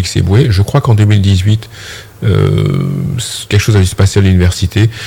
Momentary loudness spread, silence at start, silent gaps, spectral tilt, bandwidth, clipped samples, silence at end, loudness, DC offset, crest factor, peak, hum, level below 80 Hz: 8 LU; 0 s; none; -6 dB/octave; 16 kHz; under 0.1%; 0 s; -11 LUFS; under 0.1%; 10 dB; 0 dBFS; none; -34 dBFS